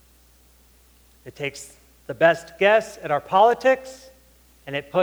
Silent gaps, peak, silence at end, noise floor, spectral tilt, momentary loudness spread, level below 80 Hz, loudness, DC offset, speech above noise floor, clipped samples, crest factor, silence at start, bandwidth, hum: none; -2 dBFS; 0 s; -55 dBFS; -4.5 dB/octave; 21 LU; -58 dBFS; -21 LUFS; under 0.1%; 34 dB; under 0.1%; 20 dB; 1.25 s; over 20 kHz; none